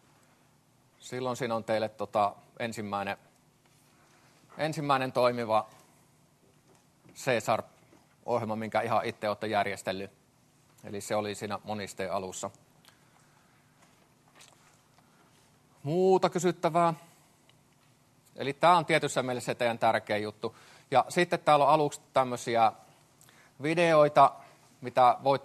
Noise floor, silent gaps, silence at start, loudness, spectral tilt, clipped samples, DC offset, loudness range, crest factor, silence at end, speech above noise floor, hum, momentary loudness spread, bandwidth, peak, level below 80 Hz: -65 dBFS; none; 1.05 s; -29 LUFS; -5 dB/octave; under 0.1%; under 0.1%; 10 LU; 22 dB; 0 s; 37 dB; none; 15 LU; 13 kHz; -8 dBFS; -76 dBFS